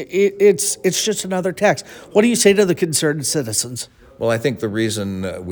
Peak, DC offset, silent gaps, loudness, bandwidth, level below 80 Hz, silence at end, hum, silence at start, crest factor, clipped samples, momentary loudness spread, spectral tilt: 0 dBFS; under 0.1%; none; -18 LUFS; over 20 kHz; -58 dBFS; 0 s; none; 0 s; 18 dB; under 0.1%; 11 LU; -4 dB/octave